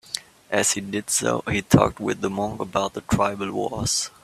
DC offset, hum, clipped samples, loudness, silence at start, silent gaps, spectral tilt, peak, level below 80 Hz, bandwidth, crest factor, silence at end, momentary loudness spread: under 0.1%; none; under 0.1%; -23 LUFS; 0.1 s; none; -4 dB/octave; 0 dBFS; -48 dBFS; 16 kHz; 24 dB; 0.15 s; 8 LU